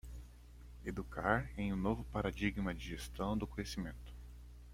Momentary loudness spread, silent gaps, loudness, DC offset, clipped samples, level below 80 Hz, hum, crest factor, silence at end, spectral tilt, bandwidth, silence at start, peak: 20 LU; none; -40 LUFS; under 0.1%; under 0.1%; -50 dBFS; 60 Hz at -50 dBFS; 26 dB; 0 s; -6 dB/octave; 16 kHz; 0.05 s; -16 dBFS